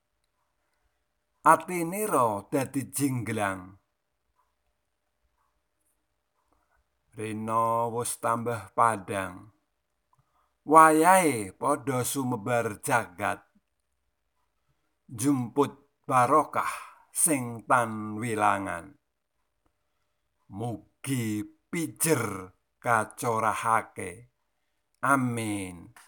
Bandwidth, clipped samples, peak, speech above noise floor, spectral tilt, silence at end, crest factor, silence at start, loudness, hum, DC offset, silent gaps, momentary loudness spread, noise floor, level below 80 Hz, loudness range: 19.5 kHz; under 0.1%; -4 dBFS; 54 dB; -4.5 dB/octave; 0.2 s; 26 dB; 1.45 s; -26 LUFS; none; under 0.1%; none; 15 LU; -81 dBFS; -72 dBFS; 10 LU